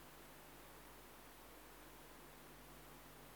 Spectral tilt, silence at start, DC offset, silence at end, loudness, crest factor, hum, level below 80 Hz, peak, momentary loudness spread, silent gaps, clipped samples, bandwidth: -3 dB/octave; 0 s; under 0.1%; 0 s; -59 LUFS; 12 dB; none; -70 dBFS; -46 dBFS; 0 LU; none; under 0.1%; over 20 kHz